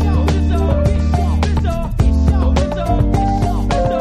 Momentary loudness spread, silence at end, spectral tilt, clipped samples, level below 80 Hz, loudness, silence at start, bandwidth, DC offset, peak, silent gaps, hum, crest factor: 3 LU; 0 s; -7.5 dB/octave; under 0.1%; -16 dBFS; -16 LUFS; 0 s; 9.8 kHz; under 0.1%; -2 dBFS; none; none; 12 dB